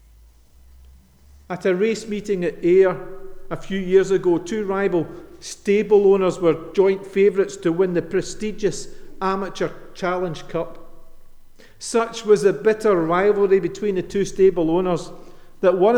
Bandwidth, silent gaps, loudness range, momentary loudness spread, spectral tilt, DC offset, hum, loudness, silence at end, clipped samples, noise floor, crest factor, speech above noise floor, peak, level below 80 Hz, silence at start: 11 kHz; none; 7 LU; 14 LU; -6 dB/octave; under 0.1%; none; -20 LUFS; 0 s; under 0.1%; -50 dBFS; 16 dB; 30 dB; -4 dBFS; -44 dBFS; 1.5 s